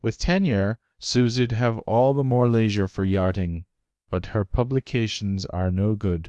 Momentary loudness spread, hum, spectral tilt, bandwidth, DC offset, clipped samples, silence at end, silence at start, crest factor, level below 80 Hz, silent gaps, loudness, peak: 8 LU; none; -6.5 dB/octave; 8.6 kHz; under 0.1%; under 0.1%; 0 s; 0.05 s; 16 dB; -40 dBFS; none; -23 LUFS; -8 dBFS